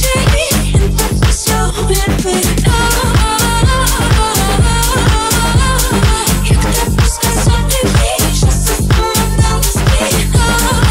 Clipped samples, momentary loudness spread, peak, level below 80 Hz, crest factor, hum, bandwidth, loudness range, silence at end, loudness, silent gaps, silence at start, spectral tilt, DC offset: under 0.1%; 2 LU; 0 dBFS; -16 dBFS; 10 dB; none; 16.5 kHz; 1 LU; 0 s; -12 LUFS; none; 0 s; -4 dB/octave; 0.2%